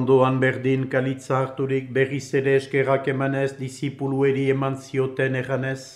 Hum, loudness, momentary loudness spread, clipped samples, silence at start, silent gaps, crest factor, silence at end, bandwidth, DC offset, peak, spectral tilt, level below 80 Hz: none; -23 LUFS; 6 LU; under 0.1%; 0 s; none; 16 dB; 0 s; 11.5 kHz; under 0.1%; -6 dBFS; -7 dB/octave; -64 dBFS